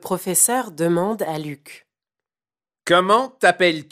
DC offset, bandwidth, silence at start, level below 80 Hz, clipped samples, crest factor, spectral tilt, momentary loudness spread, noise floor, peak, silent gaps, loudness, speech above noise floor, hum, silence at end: under 0.1%; 16 kHz; 0.05 s; -68 dBFS; under 0.1%; 18 dB; -3 dB/octave; 15 LU; under -90 dBFS; -2 dBFS; none; -18 LUFS; over 71 dB; none; 0.1 s